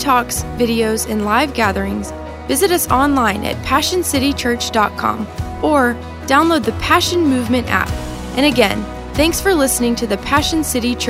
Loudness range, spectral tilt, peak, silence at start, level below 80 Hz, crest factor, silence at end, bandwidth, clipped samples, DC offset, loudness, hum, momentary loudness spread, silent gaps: 1 LU; -4 dB/octave; 0 dBFS; 0 s; -34 dBFS; 16 dB; 0 s; 16 kHz; under 0.1%; under 0.1%; -16 LUFS; none; 9 LU; none